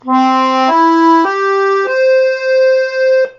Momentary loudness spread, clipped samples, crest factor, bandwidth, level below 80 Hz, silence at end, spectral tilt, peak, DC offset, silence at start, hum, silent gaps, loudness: 3 LU; under 0.1%; 10 dB; 7.6 kHz; -68 dBFS; 0.1 s; 0 dB/octave; 0 dBFS; under 0.1%; 0.05 s; none; none; -11 LUFS